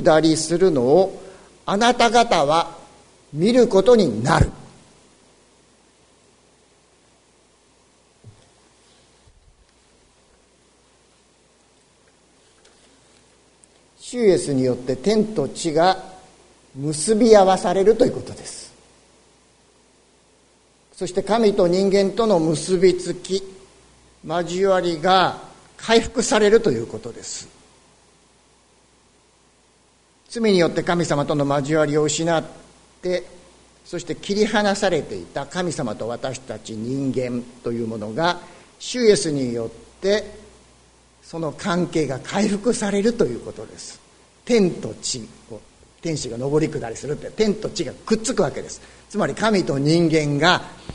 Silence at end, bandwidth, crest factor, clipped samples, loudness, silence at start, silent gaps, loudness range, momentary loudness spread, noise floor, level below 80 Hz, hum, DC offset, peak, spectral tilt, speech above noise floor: 0 s; 11 kHz; 22 dB; under 0.1%; -20 LUFS; 0 s; none; 7 LU; 17 LU; -57 dBFS; -46 dBFS; none; under 0.1%; 0 dBFS; -5 dB/octave; 38 dB